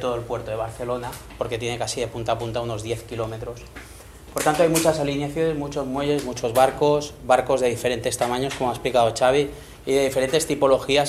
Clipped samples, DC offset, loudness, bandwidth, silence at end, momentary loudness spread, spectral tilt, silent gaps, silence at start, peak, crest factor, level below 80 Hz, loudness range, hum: under 0.1%; under 0.1%; -23 LUFS; 16 kHz; 0 s; 12 LU; -4.5 dB/octave; none; 0 s; -2 dBFS; 20 dB; -46 dBFS; 7 LU; none